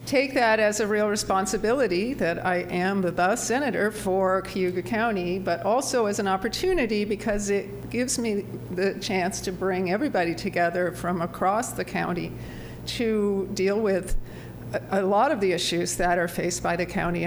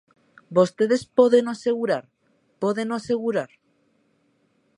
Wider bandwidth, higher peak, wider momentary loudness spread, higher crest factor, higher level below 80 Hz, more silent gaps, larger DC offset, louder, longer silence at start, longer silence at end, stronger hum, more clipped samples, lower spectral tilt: first, over 20 kHz vs 10.5 kHz; second, -10 dBFS vs -4 dBFS; second, 6 LU vs 10 LU; about the same, 16 dB vs 20 dB; first, -42 dBFS vs -68 dBFS; neither; neither; second, -25 LUFS vs -22 LUFS; second, 0 s vs 0.5 s; second, 0 s vs 1.3 s; neither; neither; second, -4.5 dB/octave vs -6 dB/octave